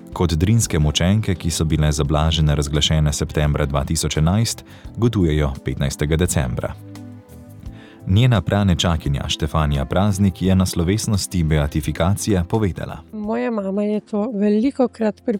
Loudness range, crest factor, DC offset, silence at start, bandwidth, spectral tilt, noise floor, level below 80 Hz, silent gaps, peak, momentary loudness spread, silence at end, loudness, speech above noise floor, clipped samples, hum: 3 LU; 14 dB; under 0.1%; 0.05 s; 17 kHz; -5.5 dB/octave; -39 dBFS; -30 dBFS; none; -4 dBFS; 11 LU; 0 s; -19 LUFS; 21 dB; under 0.1%; none